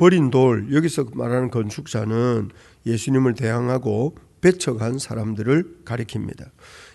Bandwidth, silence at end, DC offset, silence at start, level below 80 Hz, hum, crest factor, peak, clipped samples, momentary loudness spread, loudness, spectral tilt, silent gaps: 12 kHz; 0.1 s; under 0.1%; 0 s; -54 dBFS; none; 20 dB; 0 dBFS; under 0.1%; 12 LU; -21 LUFS; -6.5 dB/octave; none